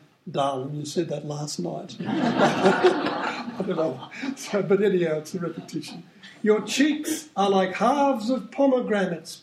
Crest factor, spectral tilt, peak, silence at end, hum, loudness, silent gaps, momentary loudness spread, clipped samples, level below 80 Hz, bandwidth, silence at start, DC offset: 20 dB; -5 dB/octave; -4 dBFS; 0.05 s; none; -25 LUFS; none; 12 LU; under 0.1%; -72 dBFS; 16 kHz; 0.25 s; under 0.1%